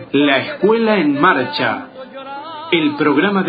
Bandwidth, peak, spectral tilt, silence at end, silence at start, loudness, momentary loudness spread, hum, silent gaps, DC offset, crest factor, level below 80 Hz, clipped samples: 5 kHz; 0 dBFS; -9 dB/octave; 0 s; 0 s; -15 LUFS; 16 LU; none; none; under 0.1%; 16 dB; -60 dBFS; under 0.1%